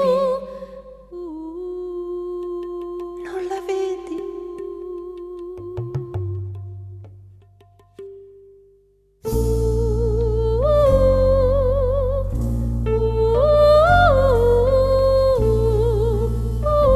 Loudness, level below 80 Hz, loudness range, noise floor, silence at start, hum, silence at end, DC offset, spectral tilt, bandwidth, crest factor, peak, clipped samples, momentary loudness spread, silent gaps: -19 LUFS; -26 dBFS; 16 LU; -57 dBFS; 0 s; none; 0 s; under 0.1%; -7.5 dB/octave; 13 kHz; 16 dB; -4 dBFS; under 0.1%; 19 LU; none